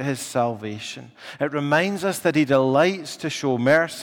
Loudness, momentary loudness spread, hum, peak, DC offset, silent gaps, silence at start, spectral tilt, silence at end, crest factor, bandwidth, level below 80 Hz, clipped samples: -22 LUFS; 13 LU; none; -6 dBFS; under 0.1%; none; 0 s; -5 dB/octave; 0 s; 16 dB; 17.5 kHz; -66 dBFS; under 0.1%